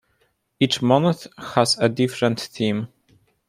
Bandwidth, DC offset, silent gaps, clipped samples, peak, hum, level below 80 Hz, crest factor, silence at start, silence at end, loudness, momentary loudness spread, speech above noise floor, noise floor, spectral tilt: 15.5 kHz; under 0.1%; none; under 0.1%; -2 dBFS; none; -62 dBFS; 20 dB; 0.6 s; 0.6 s; -21 LUFS; 9 LU; 46 dB; -67 dBFS; -5 dB/octave